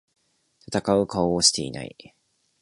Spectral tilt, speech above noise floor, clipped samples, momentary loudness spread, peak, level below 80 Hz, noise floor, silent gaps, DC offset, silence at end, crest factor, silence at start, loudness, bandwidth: -3.5 dB/octave; 41 dB; under 0.1%; 17 LU; -4 dBFS; -54 dBFS; -64 dBFS; none; under 0.1%; 0.75 s; 22 dB; 0.7 s; -22 LUFS; 11.5 kHz